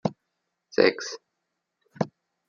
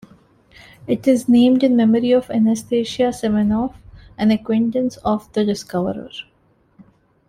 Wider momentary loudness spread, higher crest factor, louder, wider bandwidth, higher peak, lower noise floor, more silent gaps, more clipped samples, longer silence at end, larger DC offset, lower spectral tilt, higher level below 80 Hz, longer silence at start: first, 14 LU vs 11 LU; first, 26 dB vs 16 dB; second, -27 LUFS vs -18 LUFS; second, 7.4 kHz vs 14 kHz; about the same, -4 dBFS vs -4 dBFS; first, -81 dBFS vs -52 dBFS; neither; neither; second, 0.4 s vs 1.05 s; neither; second, -5 dB/octave vs -6.5 dB/octave; second, -72 dBFS vs -50 dBFS; second, 0.05 s vs 0.85 s